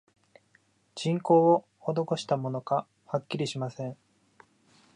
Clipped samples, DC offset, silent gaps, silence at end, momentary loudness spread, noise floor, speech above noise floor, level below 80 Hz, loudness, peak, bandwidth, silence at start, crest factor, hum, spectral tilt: under 0.1%; under 0.1%; none; 1.05 s; 14 LU; -67 dBFS; 40 dB; -78 dBFS; -28 LUFS; -10 dBFS; 10.5 kHz; 0.95 s; 20 dB; none; -6.5 dB/octave